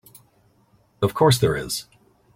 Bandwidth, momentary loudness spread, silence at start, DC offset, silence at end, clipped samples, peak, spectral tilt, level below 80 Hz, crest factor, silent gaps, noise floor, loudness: 16.5 kHz; 12 LU; 1 s; under 0.1%; 0.55 s; under 0.1%; -4 dBFS; -5 dB/octave; -50 dBFS; 20 dB; none; -60 dBFS; -21 LUFS